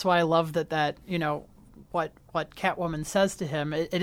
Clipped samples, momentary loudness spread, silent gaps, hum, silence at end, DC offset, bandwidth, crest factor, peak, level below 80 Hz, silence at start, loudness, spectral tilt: under 0.1%; 9 LU; none; none; 0 s; under 0.1%; 17 kHz; 18 dB; -10 dBFS; -56 dBFS; 0 s; -28 LUFS; -5 dB/octave